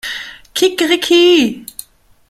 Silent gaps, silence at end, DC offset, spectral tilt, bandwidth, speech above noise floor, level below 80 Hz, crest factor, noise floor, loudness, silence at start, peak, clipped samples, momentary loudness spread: none; 0.65 s; under 0.1%; -2.5 dB/octave; 15 kHz; 25 dB; -54 dBFS; 14 dB; -37 dBFS; -12 LUFS; 0.05 s; -2 dBFS; under 0.1%; 20 LU